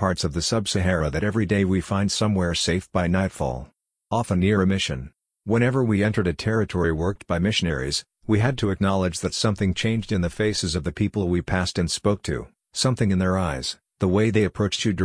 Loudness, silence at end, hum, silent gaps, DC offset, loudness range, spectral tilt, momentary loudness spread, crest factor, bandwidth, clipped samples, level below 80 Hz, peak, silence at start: -23 LUFS; 0 s; none; none; under 0.1%; 1 LU; -5.5 dB/octave; 6 LU; 16 dB; 10.5 kHz; under 0.1%; -42 dBFS; -6 dBFS; 0 s